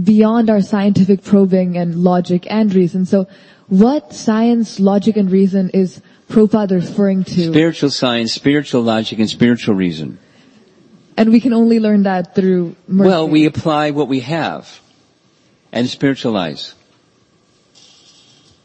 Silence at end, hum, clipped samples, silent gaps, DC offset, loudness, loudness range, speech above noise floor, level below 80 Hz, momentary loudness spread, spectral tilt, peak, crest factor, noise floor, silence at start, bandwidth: 1.95 s; none; under 0.1%; none; under 0.1%; -14 LUFS; 7 LU; 41 dB; -54 dBFS; 8 LU; -7 dB/octave; 0 dBFS; 14 dB; -55 dBFS; 0 s; 8.6 kHz